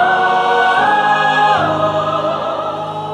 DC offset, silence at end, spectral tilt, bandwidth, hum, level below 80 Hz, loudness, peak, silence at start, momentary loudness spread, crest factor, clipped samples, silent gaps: under 0.1%; 0 s; -4.5 dB/octave; 10.5 kHz; none; -52 dBFS; -14 LUFS; -2 dBFS; 0 s; 8 LU; 12 dB; under 0.1%; none